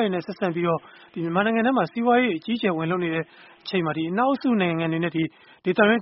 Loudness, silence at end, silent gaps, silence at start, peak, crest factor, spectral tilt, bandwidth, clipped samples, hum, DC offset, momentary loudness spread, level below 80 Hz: -24 LUFS; 0 s; none; 0 s; -4 dBFS; 18 dB; -4.5 dB/octave; 5.8 kHz; under 0.1%; none; under 0.1%; 10 LU; -66 dBFS